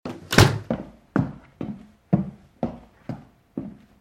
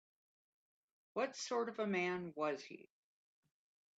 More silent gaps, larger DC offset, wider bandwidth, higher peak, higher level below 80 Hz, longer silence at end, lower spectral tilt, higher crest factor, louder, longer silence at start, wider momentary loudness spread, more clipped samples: neither; neither; first, 16.5 kHz vs 8.8 kHz; first, 0 dBFS vs -26 dBFS; first, -44 dBFS vs -86 dBFS; second, 0.3 s vs 1.15 s; about the same, -5 dB/octave vs -4.5 dB/octave; first, 26 dB vs 18 dB; first, -24 LUFS vs -41 LUFS; second, 0.05 s vs 1.15 s; first, 21 LU vs 10 LU; neither